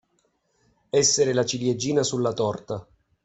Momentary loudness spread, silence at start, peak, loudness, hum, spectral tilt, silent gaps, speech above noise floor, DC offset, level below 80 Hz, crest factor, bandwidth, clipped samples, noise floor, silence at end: 13 LU; 0.95 s; -8 dBFS; -23 LUFS; none; -3.5 dB/octave; none; 47 dB; under 0.1%; -62 dBFS; 16 dB; 8.4 kHz; under 0.1%; -70 dBFS; 0.4 s